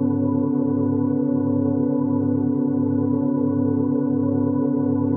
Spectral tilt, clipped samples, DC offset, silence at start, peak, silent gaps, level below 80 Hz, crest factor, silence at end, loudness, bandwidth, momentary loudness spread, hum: -15 dB/octave; under 0.1%; under 0.1%; 0 s; -10 dBFS; none; -66 dBFS; 10 dB; 0 s; -21 LUFS; 1.6 kHz; 0 LU; none